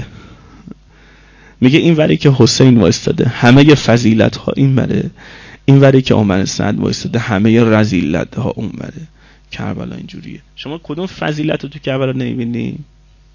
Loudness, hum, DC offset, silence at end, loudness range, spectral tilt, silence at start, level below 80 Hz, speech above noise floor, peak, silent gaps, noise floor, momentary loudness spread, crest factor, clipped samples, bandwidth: -12 LUFS; none; under 0.1%; 0.5 s; 12 LU; -6.5 dB/octave; 0 s; -38 dBFS; 31 dB; 0 dBFS; none; -43 dBFS; 19 LU; 14 dB; 0.3%; 7.4 kHz